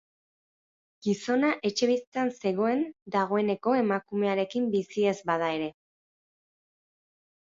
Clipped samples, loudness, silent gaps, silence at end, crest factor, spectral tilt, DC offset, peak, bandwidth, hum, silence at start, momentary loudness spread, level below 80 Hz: under 0.1%; -28 LUFS; 2.07-2.12 s, 3.02-3.06 s; 1.7 s; 16 dB; -5.5 dB/octave; under 0.1%; -12 dBFS; 7.8 kHz; none; 1.05 s; 5 LU; -74 dBFS